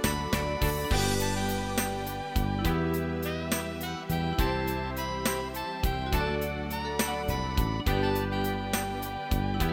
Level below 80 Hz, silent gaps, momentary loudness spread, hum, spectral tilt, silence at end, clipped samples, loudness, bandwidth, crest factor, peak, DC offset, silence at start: -36 dBFS; none; 5 LU; none; -4.5 dB/octave; 0 s; under 0.1%; -30 LUFS; 17 kHz; 16 dB; -12 dBFS; under 0.1%; 0 s